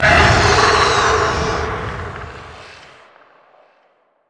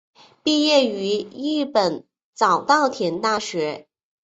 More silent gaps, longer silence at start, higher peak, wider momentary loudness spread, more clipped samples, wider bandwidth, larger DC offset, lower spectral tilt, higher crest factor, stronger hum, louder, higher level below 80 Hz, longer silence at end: second, none vs 2.23-2.33 s; second, 0 s vs 0.45 s; first, 0 dBFS vs -4 dBFS; first, 23 LU vs 10 LU; neither; first, 10.5 kHz vs 8.2 kHz; neither; about the same, -3.5 dB/octave vs -3.5 dB/octave; about the same, 18 dB vs 18 dB; neither; first, -14 LUFS vs -21 LUFS; first, -30 dBFS vs -66 dBFS; first, 1.55 s vs 0.4 s